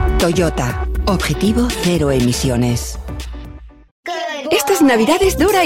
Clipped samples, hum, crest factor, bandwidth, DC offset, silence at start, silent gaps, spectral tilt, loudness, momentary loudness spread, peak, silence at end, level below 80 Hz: under 0.1%; none; 14 dB; 16.5 kHz; under 0.1%; 0 s; 3.91-4.03 s; -5 dB/octave; -16 LUFS; 16 LU; -2 dBFS; 0 s; -26 dBFS